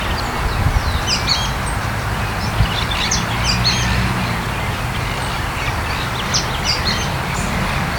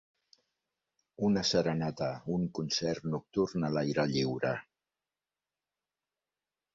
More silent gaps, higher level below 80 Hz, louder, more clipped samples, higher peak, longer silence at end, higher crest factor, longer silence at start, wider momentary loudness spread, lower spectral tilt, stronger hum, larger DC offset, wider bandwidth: neither; first, -26 dBFS vs -64 dBFS; first, -18 LUFS vs -32 LUFS; neither; first, -2 dBFS vs -14 dBFS; second, 0 s vs 2.15 s; about the same, 16 dB vs 20 dB; second, 0 s vs 1.2 s; about the same, 5 LU vs 6 LU; second, -3.5 dB/octave vs -5.5 dB/octave; neither; neither; first, 19 kHz vs 7.8 kHz